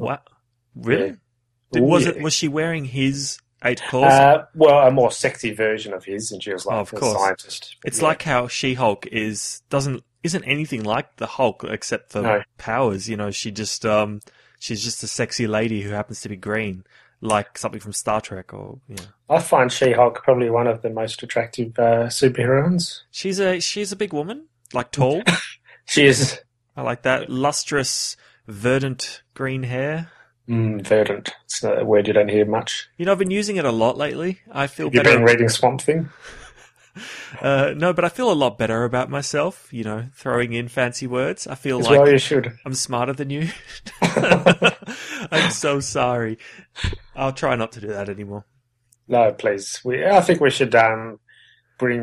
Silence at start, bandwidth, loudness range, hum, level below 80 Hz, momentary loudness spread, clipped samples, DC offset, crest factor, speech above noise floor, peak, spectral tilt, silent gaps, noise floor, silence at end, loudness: 0 s; 13 kHz; 7 LU; none; -50 dBFS; 15 LU; under 0.1%; under 0.1%; 20 dB; 46 dB; 0 dBFS; -4.5 dB/octave; none; -66 dBFS; 0 s; -20 LUFS